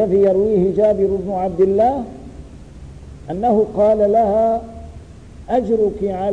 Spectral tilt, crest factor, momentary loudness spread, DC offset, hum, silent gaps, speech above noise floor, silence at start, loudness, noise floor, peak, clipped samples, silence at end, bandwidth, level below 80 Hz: -9 dB/octave; 12 dB; 22 LU; 0.3%; none; none; 22 dB; 0 s; -17 LUFS; -38 dBFS; -6 dBFS; under 0.1%; 0 s; 9.4 kHz; -40 dBFS